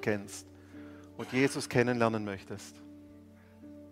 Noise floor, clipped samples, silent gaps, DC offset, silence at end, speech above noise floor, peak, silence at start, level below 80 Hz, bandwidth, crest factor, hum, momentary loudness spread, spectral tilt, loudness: -55 dBFS; under 0.1%; none; under 0.1%; 0 s; 23 dB; -10 dBFS; 0 s; -68 dBFS; 16 kHz; 24 dB; none; 23 LU; -5.5 dB/octave; -31 LUFS